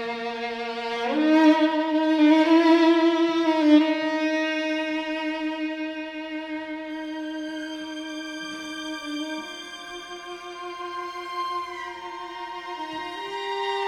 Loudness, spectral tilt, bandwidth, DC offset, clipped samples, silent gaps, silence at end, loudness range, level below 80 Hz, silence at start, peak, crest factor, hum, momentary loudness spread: -24 LUFS; -3.5 dB/octave; 10 kHz; under 0.1%; under 0.1%; none; 0 s; 14 LU; -68 dBFS; 0 s; -6 dBFS; 18 dB; none; 17 LU